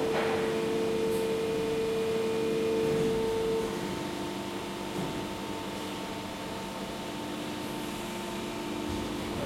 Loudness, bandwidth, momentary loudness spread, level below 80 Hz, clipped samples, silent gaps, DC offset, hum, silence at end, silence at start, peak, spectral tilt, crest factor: -32 LUFS; 16.5 kHz; 8 LU; -54 dBFS; under 0.1%; none; under 0.1%; none; 0 s; 0 s; -18 dBFS; -5 dB/octave; 14 dB